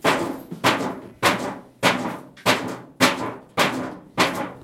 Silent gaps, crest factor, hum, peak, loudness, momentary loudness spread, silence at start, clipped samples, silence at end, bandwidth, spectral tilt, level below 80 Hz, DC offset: none; 22 dB; none; -2 dBFS; -23 LUFS; 11 LU; 0.05 s; under 0.1%; 0 s; 16.5 kHz; -3.5 dB/octave; -60 dBFS; under 0.1%